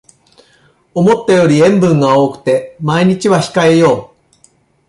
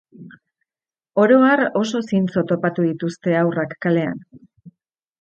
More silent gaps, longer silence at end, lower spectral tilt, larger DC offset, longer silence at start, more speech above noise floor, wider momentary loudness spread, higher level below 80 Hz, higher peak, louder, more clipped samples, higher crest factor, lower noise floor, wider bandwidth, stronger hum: neither; first, 0.85 s vs 0.5 s; about the same, -6.5 dB/octave vs -7 dB/octave; neither; first, 0.95 s vs 0.2 s; second, 41 dB vs over 72 dB; second, 7 LU vs 10 LU; first, -52 dBFS vs -64 dBFS; about the same, 0 dBFS vs -2 dBFS; first, -11 LUFS vs -19 LUFS; neither; second, 12 dB vs 18 dB; second, -51 dBFS vs under -90 dBFS; first, 11.5 kHz vs 8.6 kHz; neither